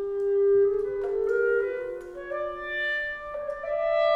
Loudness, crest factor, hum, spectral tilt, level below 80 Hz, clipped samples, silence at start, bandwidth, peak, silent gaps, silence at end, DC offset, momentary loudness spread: -27 LUFS; 12 dB; none; -5.5 dB/octave; -56 dBFS; under 0.1%; 0 s; 5.6 kHz; -14 dBFS; none; 0 s; under 0.1%; 12 LU